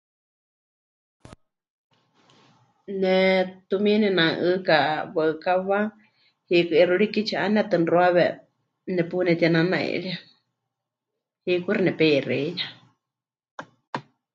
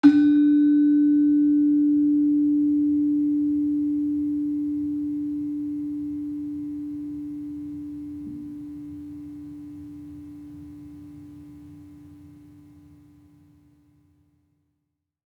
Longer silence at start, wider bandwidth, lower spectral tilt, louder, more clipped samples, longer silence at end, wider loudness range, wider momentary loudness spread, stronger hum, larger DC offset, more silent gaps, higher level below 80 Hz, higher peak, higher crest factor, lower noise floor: first, 2.9 s vs 0.05 s; first, 7.4 kHz vs 4.4 kHz; second, -7 dB/octave vs -8.5 dB/octave; about the same, -22 LUFS vs -23 LUFS; neither; second, 0.35 s vs 3.05 s; second, 5 LU vs 23 LU; second, 16 LU vs 23 LU; neither; neither; first, 13.51-13.58 s, 13.87-13.93 s vs none; second, -70 dBFS vs -62 dBFS; about the same, -4 dBFS vs -4 dBFS; about the same, 20 dB vs 20 dB; first, -88 dBFS vs -80 dBFS